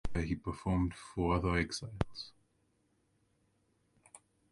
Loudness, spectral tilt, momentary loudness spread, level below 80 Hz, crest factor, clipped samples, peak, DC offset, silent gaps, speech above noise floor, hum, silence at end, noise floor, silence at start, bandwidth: -36 LUFS; -6 dB/octave; 8 LU; -48 dBFS; 24 dB; under 0.1%; -14 dBFS; under 0.1%; none; 41 dB; none; 0.35 s; -76 dBFS; 0.05 s; 11.5 kHz